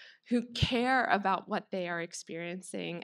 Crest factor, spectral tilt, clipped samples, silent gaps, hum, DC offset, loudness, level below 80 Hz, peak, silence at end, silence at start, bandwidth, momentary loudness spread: 22 dB; -4.5 dB/octave; under 0.1%; none; none; under 0.1%; -32 LUFS; -54 dBFS; -10 dBFS; 0 s; 0 s; 12.5 kHz; 12 LU